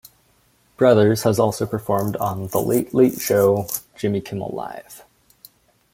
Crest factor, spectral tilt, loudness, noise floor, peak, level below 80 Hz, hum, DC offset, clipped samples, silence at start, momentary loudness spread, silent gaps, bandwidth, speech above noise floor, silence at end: 20 dB; -6 dB/octave; -20 LUFS; -60 dBFS; 0 dBFS; -56 dBFS; none; under 0.1%; under 0.1%; 0.8 s; 13 LU; none; 17 kHz; 40 dB; 0.95 s